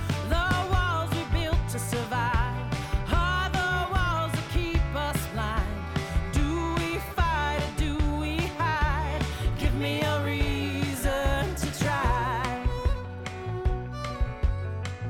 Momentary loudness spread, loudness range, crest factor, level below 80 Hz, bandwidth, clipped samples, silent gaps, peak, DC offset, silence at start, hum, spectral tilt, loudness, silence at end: 5 LU; 1 LU; 14 dB; -32 dBFS; 18 kHz; under 0.1%; none; -12 dBFS; under 0.1%; 0 s; none; -5.5 dB/octave; -28 LUFS; 0 s